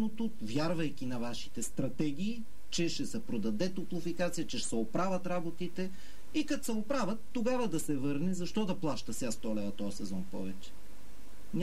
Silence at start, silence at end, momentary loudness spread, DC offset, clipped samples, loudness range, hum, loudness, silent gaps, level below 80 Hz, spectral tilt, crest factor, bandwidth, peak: 0 s; 0 s; 8 LU; 2%; under 0.1%; 2 LU; none; -36 LUFS; none; -58 dBFS; -5 dB/octave; 16 dB; 16 kHz; -18 dBFS